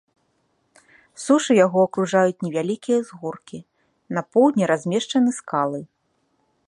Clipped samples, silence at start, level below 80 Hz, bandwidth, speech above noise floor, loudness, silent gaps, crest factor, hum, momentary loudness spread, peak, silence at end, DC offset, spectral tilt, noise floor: under 0.1%; 1.2 s; -72 dBFS; 11.5 kHz; 48 dB; -21 LUFS; none; 18 dB; none; 16 LU; -4 dBFS; 0.8 s; under 0.1%; -5.5 dB/octave; -69 dBFS